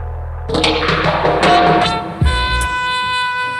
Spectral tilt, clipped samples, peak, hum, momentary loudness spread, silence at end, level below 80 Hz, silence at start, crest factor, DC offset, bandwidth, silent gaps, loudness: -4.5 dB/octave; under 0.1%; 0 dBFS; none; 6 LU; 0 s; -26 dBFS; 0 s; 14 dB; under 0.1%; 13.5 kHz; none; -14 LUFS